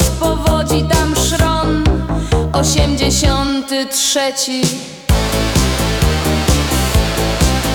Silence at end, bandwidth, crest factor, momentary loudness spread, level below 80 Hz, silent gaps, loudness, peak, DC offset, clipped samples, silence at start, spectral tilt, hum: 0 s; 19.5 kHz; 12 dB; 4 LU; -20 dBFS; none; -15 LUFS; -2 dBFS; under 0.1%; under 0.1%; 0 s; -4 dB/octave; none